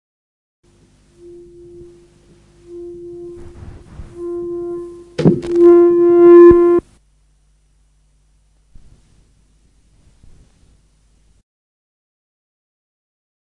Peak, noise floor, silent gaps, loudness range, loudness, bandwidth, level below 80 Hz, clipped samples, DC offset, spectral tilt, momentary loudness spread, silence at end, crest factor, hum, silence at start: 0 dBFS; -56 dBFS; none; 19 LU; -10 LUFS; 5 kHz; -44 dBFS; under 0.1%; under 0.1%; -9.5 dB/octave; 28 LU; 6.8 s; 16 dB; none; 2.7 s